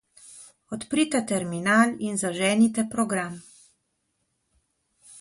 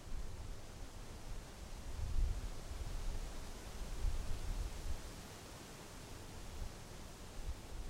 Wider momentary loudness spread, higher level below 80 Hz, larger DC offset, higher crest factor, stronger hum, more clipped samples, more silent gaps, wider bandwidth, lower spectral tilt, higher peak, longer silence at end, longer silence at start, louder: first, 17 LU vs 8 LU; second, -66 dBFS vs -44 dBFS; neither; about the same, 22 dB vs 18 dB; neither; neither; neither; second, 11.5 kHz vs 16 kHz; about the same, -4 dB/octave vs -4.5 dB/octave; first, -6 dBFS vs -26 dBFS; about the same, 0 s vs 0 s; first, 0.25 s vs 0 s; first, -24 LUFS vs -49 LUFS